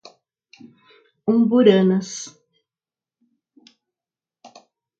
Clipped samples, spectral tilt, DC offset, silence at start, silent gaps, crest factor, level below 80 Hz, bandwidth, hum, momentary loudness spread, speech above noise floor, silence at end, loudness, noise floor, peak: under 0.1%; -6 dB/octave; under 0.1%; 1.25 s; none; 22 dB; -72 dBFS; 7.8 kHz; none; 18 LU; over 74 dB; 2.7 s; -18 LUFS; under -90 dBFS; -2 dBFS